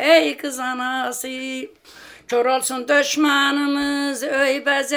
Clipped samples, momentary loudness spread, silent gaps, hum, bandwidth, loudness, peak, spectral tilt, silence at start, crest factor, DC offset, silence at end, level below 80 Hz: under 0.1%; 11 LU; none; none; over 20 kHz; -20 LUFS; -2 dBFS; -1 dB/octave; 0 s; 18 dB; under 0.1%; 0 s; -64 dBFS